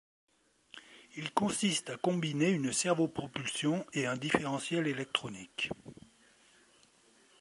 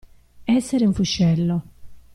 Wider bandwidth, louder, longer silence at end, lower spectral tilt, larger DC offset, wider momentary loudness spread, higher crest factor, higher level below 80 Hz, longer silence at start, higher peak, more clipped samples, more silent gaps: about the same, 11.5 kHz vs 12 kHz; second, -33 LUFS vs -21 LUFS; first, 1.45 s vs 0.15 s; second, -4 dB/octave vs -6 dB/octave; neither; first, 17 LU vs 8 LU; first, 26 dB vs 14 dB; second, -70 dBFS vs -44 dBFS; first, 0.75 s vs 0.4 s; about the same, -10 dBFS vs -8 dBFS; neither; neither